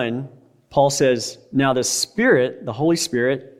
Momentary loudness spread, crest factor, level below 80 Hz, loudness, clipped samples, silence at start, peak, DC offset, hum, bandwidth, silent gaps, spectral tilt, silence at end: 8 LU; 16 dB; -58 dBFS; -19 LUFS; under 0.1%; 0 s; -4 dBFS; under 0.1%; none; 16 kHz; none; -4 dB/octave; 0.15 s